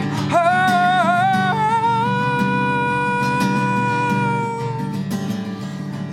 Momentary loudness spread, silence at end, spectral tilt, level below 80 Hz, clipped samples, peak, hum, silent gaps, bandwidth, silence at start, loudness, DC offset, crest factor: 9 LU; 0 s; -6 dB/octave; -54 dBFS; under 0.1%; -6 dBFS; none; none; 15.5 kHz; 0 s; -19 LUFS; under 0.1%; 14 dB